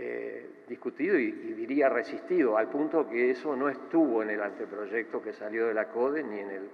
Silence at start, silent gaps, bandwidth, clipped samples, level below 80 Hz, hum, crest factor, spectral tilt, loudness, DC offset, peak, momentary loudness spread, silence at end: 0 s; none; 6.4 kHz; under 0.1%; under -90 dBFS; none; 16 dB; -7.5 dB/octave; -30 LUFS; under 0.1%; -14 dBFS; 11 LU; 0 s